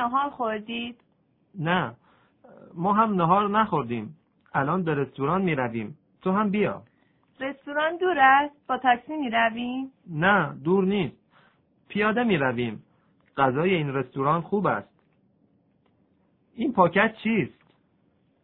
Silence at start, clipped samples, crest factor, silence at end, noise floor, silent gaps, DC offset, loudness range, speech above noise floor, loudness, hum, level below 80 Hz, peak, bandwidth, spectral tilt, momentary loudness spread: 0 s; under 0.1%; 22 dB; 0.95 s; -66 dBFS; none; under 0.1%; 4 LU; 42 dB; -25 LUFS; none; -62 dBFS; -4 dBFS; 4.1 kHz; -10 dB/octave; 13 LU